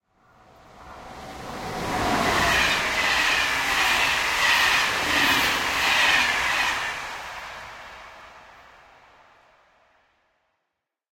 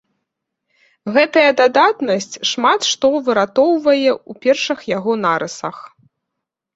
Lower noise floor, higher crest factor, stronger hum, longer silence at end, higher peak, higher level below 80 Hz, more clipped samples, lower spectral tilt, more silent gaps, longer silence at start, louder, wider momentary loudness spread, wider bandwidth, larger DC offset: about the same, -81 dBFS vs -80 dBFS; about the same, 18 dB vs 16 dB; neither; first, 2.75 s vs 0.9 s; second, -6 dBFS vs -2 dBFS; first, -48 dBFS vs -62 dBFS; neither; second, -1.5 dB/octave vs -3 dB/octave; neither; second, 0.75 s vs 1.05 s; second, -20 LUFS vs -15 LUFS; first, 21 LU vs 8 LU; first, 16.5 kHz vs 8 kHz; neither